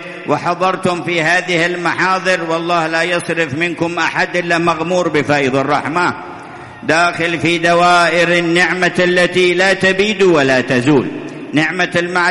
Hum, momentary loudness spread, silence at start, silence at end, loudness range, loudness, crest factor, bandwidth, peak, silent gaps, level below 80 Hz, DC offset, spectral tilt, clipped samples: none; 6 LU; 0 s; 0 s; 4 LU; -13 LUFS; 14 dB; 11.5 kHz; 0 dBFS; none; -50 dBFS; under 0.1%; -4.5 dB/octave; under 0.1%